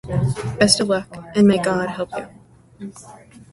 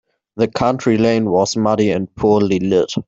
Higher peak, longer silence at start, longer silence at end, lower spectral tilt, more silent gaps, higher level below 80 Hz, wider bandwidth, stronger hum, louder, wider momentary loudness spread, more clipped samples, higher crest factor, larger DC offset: about the same, 0 dBFS vs -2 dBFS; second, 0.05 s vs 0.35 s; about the same, 0.1 s vs 0.05 s; second, -4.5 dB/octave vs -6 dB/octave; neither; about the same, -46 dBFS vs -48 dBFS; first, 11.5 kHz vs 8 kHz; neither; second, -19 LUFS vs -16 LUFS; first, 21 LU vs 4 LU; neither; first, 20 dB vs 14 dB; neither